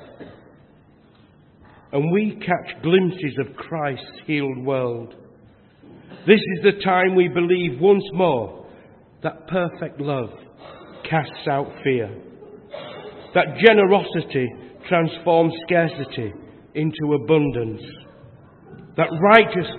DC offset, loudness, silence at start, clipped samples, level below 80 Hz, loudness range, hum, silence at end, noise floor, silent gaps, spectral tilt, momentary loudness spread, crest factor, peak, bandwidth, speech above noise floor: under 0.1%; -20 LUFS; 0 s; under 0.1%; -58 dBFS; 7 LU; none; 0 s; -52 dBFS; none; -9 dB/octave; 18 LU; 22 dB; 0 dBFS; 4.4 kHz; 33 dB